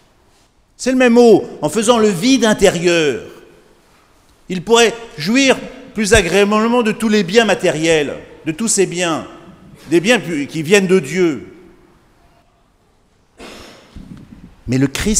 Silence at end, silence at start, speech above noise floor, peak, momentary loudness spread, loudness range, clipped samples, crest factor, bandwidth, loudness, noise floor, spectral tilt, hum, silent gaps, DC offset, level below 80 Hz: 0 s; 0.8 s; 41 dB; 0 dBFS; 14 LU; 6 LU; under 0.1%; 16 dB; 16 kHz; -14 LUFS; -55 dBFS; -4 dB/octave; none; none; under 0.1%; -38 dBFS